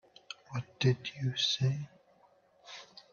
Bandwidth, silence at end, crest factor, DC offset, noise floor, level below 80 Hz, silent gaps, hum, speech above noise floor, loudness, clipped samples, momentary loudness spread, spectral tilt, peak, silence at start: 7 kHz; 0.15 s; 20 dB; under 0.1%; -66 dBFS; -70 dBFS; none; none; 34 dB; -33 LUFS; under 0.1%; 19 LU; -5 dB/octave; -14 dBFS; 0.3 s